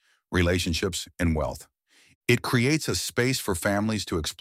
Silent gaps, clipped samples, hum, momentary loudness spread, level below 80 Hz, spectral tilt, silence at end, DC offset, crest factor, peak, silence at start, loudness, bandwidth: 2.15-2.21 s; under 0.1%; none; 7 LU; -42 dBFS; -4.5 dB/octave; 0.1 s; under 0.1%; 18 dB; -8 dBFS; 0.3 s; -26 LUFS; 16 kHz